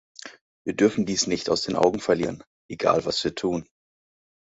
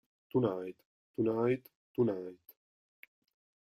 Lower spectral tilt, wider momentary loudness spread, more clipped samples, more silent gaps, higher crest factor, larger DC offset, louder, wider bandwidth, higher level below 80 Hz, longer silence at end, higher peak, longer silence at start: second, -4 dB/octave vs -10 dB/octave; first, 20 LU vs 15 LU; neither; about the same, 0.41-0.65 s, 2.47-2.69 s vs 0.85-1.14 s, 1.75-1.95 s; about the same, 20 dB vs 18 dB; neither; first, -24 LUFS vs -34 LUFS; second, 8 kHz vs 15.5 kHz; first, -56 dBFS vs -74 dBFS; second, 0.85 s vs 1.35 s; first, -4 dBFS vs -18 dBFS; about the same, 0.25 s vs 0.35 s